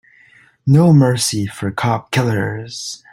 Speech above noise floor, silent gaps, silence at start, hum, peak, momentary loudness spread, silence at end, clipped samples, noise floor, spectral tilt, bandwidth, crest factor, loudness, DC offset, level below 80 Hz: 34 dB; none; 0.65 s; none; -2 dBFS; 15 LU; 0.15 s; under 0.1%; -50 dBFS; -5.5 dB/octave; 15.5 kHz; 14 dB; -16 LUFS; under 0.1%; -52 dBFS